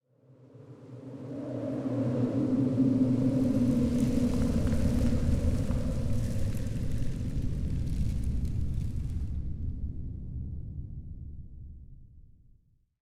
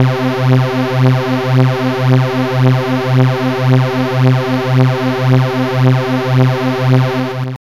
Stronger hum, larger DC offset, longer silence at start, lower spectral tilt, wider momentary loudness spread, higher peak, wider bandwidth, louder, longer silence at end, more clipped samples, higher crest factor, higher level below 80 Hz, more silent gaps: neither; second, under 0.1% vs 1%; first, 0.55 s vs 0 s; about the same, -8.5 dB/octave vs -7.5 dB/octave; first, 18 LU vs 2 LU; second, -14 dBFS vs -2 dBFS; first, 14 kHz vs 12 kHz; second, -31 LUFS vs -13 LUFS; first, 0.8 s vs 0.1 s; neither; first, 16 dB vs 10 dB; first, -36 dBFS vs -46 dBFS; neither